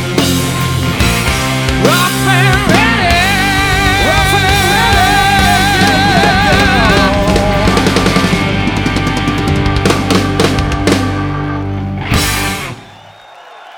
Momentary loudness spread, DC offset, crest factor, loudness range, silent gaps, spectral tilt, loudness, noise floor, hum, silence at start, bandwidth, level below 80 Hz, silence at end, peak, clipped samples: 6 LU; under 0.1%; 12 dB; 5 LU; none; -4.5 dB/octave; -11 LUFS; -36 dBFS; none; 0 s; 19 kHz; -22 dBFS; 0 s; 0 dBFS; under 0.1%